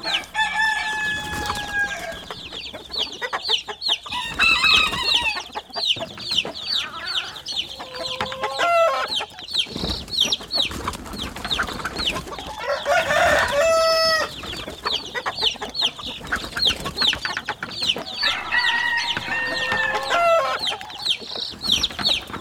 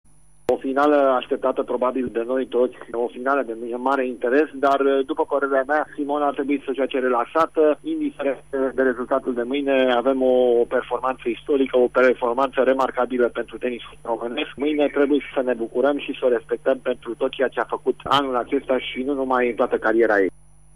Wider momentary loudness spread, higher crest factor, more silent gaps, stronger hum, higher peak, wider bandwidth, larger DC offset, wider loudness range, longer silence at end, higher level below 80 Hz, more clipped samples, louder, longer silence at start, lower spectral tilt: first, 11 LU vs 7 LU; about the same, 20 dB vs 16 dB; neither; neither; about the same, -4 dBFS vs -6 dBFS; first, over 20 kHz vs 10.5 kHz; second, under 0.1% vs 0.4%; about the same, 5 LU vs 3 LU; second, 0 s vs 0.45 s; first, -46 dBFS vs -56 dBFS; neither; about the same, -21 LUFS vs -22 LUFS; second, 0 s vs 0.5 s; second, -1.5 dB/octave vs -5.5 dB/octave